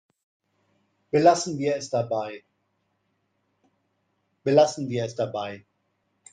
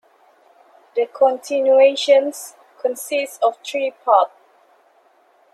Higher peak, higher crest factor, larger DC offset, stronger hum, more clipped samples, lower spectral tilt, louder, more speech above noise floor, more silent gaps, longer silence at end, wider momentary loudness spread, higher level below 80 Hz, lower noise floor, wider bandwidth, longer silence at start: second, -6 dBFS vs -2 dBFS; about the same, 22 dB vs 18 dB; neither; neither; neither; first, -5 dB/octave vs -0.5 dB/octave; second, -24 LUFS vs -18 LUFS; first, 50 dB vs 39 dB; neither; second, 0.75 s vs 1.25 s; first, 17 LU vs 13 LU; first, -72 dBFS vs -82 dBFS; first, -73 dBFS vs -56 dBFS; second, 9.6 kHz vs 13.5 kHz; first, 1.15 s vs 0.95 s